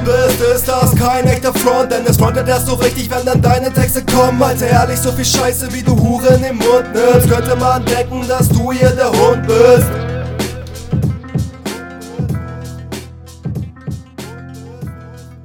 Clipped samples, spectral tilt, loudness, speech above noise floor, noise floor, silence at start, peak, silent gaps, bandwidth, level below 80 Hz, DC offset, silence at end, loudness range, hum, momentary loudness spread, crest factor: 0.2%; -5.5 dB/octave; -13 LUFS; 21 dB; -33 dBFS; 0 s; 0 dBFS; none; 19 kHz; -32 dBFS; under 0.1%; 0 s; 12 LU; none; 17 LU; 14 dB